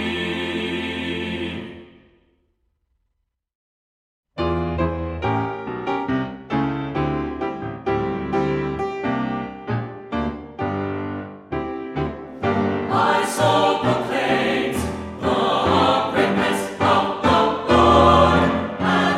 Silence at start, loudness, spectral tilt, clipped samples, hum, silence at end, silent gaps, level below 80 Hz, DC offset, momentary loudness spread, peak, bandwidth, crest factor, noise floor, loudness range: 0 s; -21 LUFS; -5.5 dB/octave; under 0.1%; none; 0 s; 3.55-4.23 s; -40 dBFS; under 0.1%; 11 LU; -2 dBFS; 16 kHz; 20 dB; -74 dBFS; 12 LU